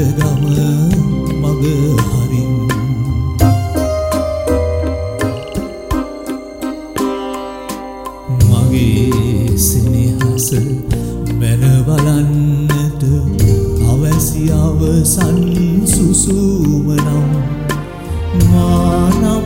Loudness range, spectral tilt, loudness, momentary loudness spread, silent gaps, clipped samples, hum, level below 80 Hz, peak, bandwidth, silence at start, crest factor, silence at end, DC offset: 6 LU; -6.5 dB/octave; -14 LUFS; 11 LU; none; under 0.1%; none; -24 dBFS; 0 dBFS; 16.5 kHz; 0 s; 12 dB; 0 s; under 0.1%